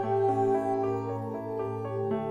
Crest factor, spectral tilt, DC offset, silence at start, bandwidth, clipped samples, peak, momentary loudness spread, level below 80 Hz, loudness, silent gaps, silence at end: 12 dB; -9 dB/octave; under 0.1%; 0 s; 8.8 kHz; under 0.1%; -16 dBFS; 8 LU; -64 dBFS; -30 LUFS; none; 0 s